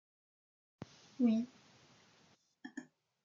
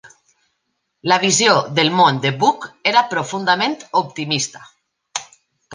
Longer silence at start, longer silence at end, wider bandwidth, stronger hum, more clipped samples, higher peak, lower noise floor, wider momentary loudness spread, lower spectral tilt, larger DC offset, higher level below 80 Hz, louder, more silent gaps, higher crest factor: first, 0.8 s vs 0.05 s; first, 0.4 s vs 0 s; second, 7.4 kHz vs 10.5 kHz; neither; neither; second, -22 dBFS vs -2 dBFS; about the same, -71 dBFS vs -72 dBFS; first, 22 LU vs 14 LU; first, -7 dB/octave vs -3 dB/octave; neither; second, -86 dBFS vs -66 dBFS; second, -36 LUFS vs -17 LUFS; neither; about the same, 20 dB vs 18 dB